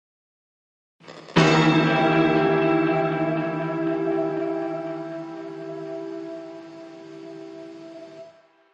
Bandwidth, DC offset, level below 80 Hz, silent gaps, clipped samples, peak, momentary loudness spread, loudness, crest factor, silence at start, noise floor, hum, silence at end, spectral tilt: 8.4 kHz; under 0.1%; -60 dBFS; none; under 0.1%; -6 dBFS; 22 LU; -22 LUFS; 20 dB; 1.05 s; -51 dBFS; none; 0.45 s; -6.5 dB/octave